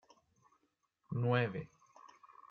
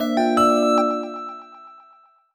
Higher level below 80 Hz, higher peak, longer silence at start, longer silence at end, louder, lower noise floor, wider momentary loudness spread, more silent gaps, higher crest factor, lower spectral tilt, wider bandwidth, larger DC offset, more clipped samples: second, -76 dBFS vs -60 dBFS; second, -20 dBFS vs -6 dBFS; first, 1.1 s vs 0 s; second, 0.45 s vs 0.6 s; second, -36 LUFS vs -19 LUFS; first, -80 dBFS vs -54 dBFS; first, 22 LU vs 18 LU; neither; first, 22 dB vs 16 dB; first, -8 dB/octave vs -4.5 dB/octave; second, 6.8 kHz vs 19 kHz; neither; neither